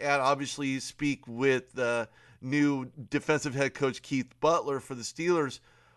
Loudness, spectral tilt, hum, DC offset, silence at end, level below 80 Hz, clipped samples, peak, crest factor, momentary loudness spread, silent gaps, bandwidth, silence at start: -30 LUFS; -5 dB/octave; none; under 0.1%; 0.4 s; -66 dBFS; under 0.1%; -12 dBFS; 18 dB; 8 LU; none; 12 kHz; 0 s